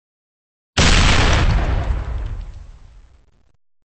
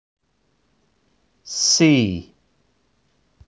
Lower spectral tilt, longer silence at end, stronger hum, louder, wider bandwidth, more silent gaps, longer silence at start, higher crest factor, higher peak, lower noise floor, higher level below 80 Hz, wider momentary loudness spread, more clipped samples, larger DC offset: about the same, -4 dB/octave vs -3.5 dB/octave; about the same, 1.25 s vs 1.25 s; neither; about the same, -17 LUFS vs -17 LUFS; about the same, 8.8 kHz vs 8 kHz; neither; second, 0.75 s vs 1.45 s; about the same, 14 dB vs 18 dB; about the same, -4 dBFS vs -4 dBFS; second, -53 dBFS vs -67 dBFS; first, -22 dBFS vs -50 dBFS; about the same, 18 LU vs 16 LU; neither; neither